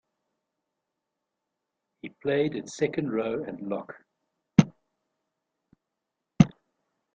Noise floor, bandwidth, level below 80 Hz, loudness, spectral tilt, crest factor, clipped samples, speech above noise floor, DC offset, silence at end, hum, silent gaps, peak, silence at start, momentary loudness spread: -85 dBFS; 8.6 kHz; -58 dBFS; -27 LUFS; -7 dB/octave; 28 dB; under 0.1%; 55 dB; under 0.1%; 0.65 s; none; none; -2 dBFS; 2.05 s; 13 LU